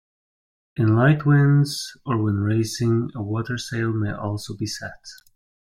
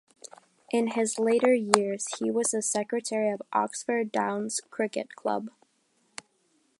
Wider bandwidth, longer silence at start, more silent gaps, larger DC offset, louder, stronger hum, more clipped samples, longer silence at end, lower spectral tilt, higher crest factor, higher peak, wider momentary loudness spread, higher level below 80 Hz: first, 15 kHz vs 11.5 kHz; about the same, 0.75 s vs 0.7 s; neither; neither; first, -22 LUFS vs -28 LUFS; neither; neither; second, 0.5 s vs 1.3 s; first, -6.5 dB/octave vs -3 dB/octave; second, 18 dB vs 28 dB; second, -4 dBFS vs 0 dBFS; second, 14 LU vs 22 LU; first, -54 dBFS vs -80 dBFS